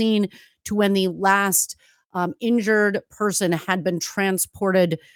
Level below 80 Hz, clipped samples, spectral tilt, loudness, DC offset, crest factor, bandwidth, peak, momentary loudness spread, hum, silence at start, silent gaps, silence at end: -64 dBFS; under 0.1%; -4 dB/octave; -21 LUFS; under 0.1%; 18 dB; 19.5 kHz; -4 dBFS; 9 LU; none; 0 s; 2.05-2.10 s; 0.2 s